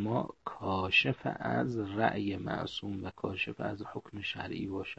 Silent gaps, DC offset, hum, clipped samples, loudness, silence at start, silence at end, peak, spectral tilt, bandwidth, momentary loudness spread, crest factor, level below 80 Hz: none; under 0.1%; none; under 0.1%; -34 LUFS; 0 s; 0.05 s; -12 dBFS; -6.5 dB/octave; 8.2 kHz; 13 LU; 22 dB; -64 dBFS